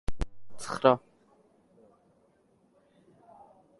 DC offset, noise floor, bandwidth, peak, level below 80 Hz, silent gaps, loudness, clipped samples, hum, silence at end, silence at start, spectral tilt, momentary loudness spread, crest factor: under 0.1%; -67 dBFS; 11.5 kHz; -6 dBFS; -46 dBFS; none; -29 LUFS; under 0.1%; none; 2.8 s; 0.1 s; -5.5 dB/octave; 17 LU; 28 dB